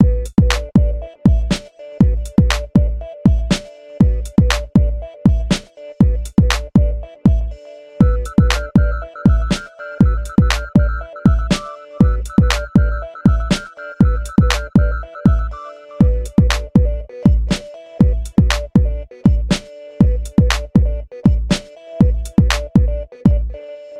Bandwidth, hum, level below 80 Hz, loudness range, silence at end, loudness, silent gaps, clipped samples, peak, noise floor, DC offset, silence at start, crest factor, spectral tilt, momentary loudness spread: 13 kHz; none; -20 dBFS; 1 LU; 0 s; -17 LUFS; none; under 0.1%; 0 dBFS; -34 dBFS; under 0.1%; 0 s; 16 dB; -6.5 dB/octave; 7 LU